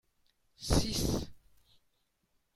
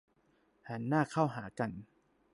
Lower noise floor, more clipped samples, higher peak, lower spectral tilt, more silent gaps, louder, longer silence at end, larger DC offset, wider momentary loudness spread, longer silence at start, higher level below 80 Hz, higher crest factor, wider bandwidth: first, -77 dBFS vs -72 dBFS; neither; first, -12 dBFS vs -16 dBFS; second, -4.5 dB/octave vs -7.5 dB/octave; neither; about the same, -33 LUFS vs -35 LUFS; first, 1.2 s vs 0.5 s; neither; about the same, 14 LU vs 13 LU; about the same, 0.6 s vs 0.65 s; first, -44 dBFS vs -70 dBFS; about the same, 24 dB vs 20 dB; first, 16 kHz vs 11.5 kHz